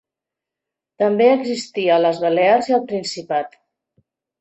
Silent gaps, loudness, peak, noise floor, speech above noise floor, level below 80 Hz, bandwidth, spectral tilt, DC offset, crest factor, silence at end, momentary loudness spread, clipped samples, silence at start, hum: none; -18 LUFS; -4 dBFS; -86 dBFS; 69 dB; -68 dBFS; 8.4 kHz; -5 dB/octave; under 0.1%; 16 dB; 0.9 s; 9 LU; under 0.1%; 1 s; none